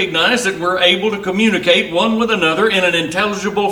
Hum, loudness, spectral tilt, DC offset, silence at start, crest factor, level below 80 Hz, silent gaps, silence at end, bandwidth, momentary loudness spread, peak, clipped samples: none; -14 LUFS; -3.5 dB/octave; under 0.1%; 0 s; 14 dB; -50 dBFS; none; 0 s; 16.5 kHz; 5 LU; 0 dBFS; under 0.1%